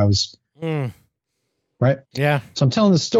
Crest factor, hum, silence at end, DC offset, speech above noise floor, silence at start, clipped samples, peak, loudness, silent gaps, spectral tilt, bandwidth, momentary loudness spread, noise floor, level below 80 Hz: 16 dB; none; 0 s; under 0.1%; 57 dB; 0 s; under 0.1%; -4 dBFS; -21 LUFS; none; -5.5 dB/octave; 13 kHz; 10 LU; -75 dBFS; -54 dBFS